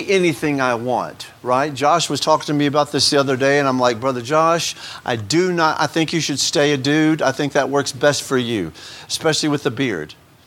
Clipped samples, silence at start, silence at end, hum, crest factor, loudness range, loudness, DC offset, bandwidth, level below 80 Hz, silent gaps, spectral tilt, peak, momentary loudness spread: under 0.1%; 0 s; 0.35 s; none; 18 dB; 2 LU; -18 LUFS; under 0.1%; 16.5 kHz; -58 dBFS; none; -4 dB/octave; 0 dBFS; 9 LU